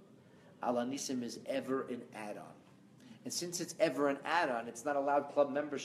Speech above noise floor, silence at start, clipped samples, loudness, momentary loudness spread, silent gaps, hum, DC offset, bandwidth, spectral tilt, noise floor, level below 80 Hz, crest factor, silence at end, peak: 24 dB; 0 s; under 0.1%; -36 LUFS; 13 LU; none; none; under 0.1%; 15 kHz; -3.5 dB/octave; -60 dBFS; -86 dBFS; 20 dB; 0 s; -18 dBFS